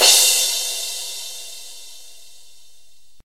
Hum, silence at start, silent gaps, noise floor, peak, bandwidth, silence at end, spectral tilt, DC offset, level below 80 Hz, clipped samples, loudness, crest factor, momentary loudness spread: none; 0 s; none; -56 dBFS; 0 dBFS; 16 kHz; 0 s; 3.5 dB/octave; 1%; -74 dBFS; under 0.1%; -16 LUFS; 22 dB; 25 LU